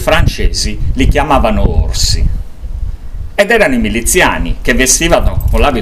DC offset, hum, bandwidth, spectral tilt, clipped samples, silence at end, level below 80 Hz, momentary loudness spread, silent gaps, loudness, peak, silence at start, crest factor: 2%; none; 15.5 kHz; -4 dB/octave; 0.4%; 0 s; -14 dBFS; 15 LU; none; -11 LUFS; 0 dBFS; 0 s; 10 dB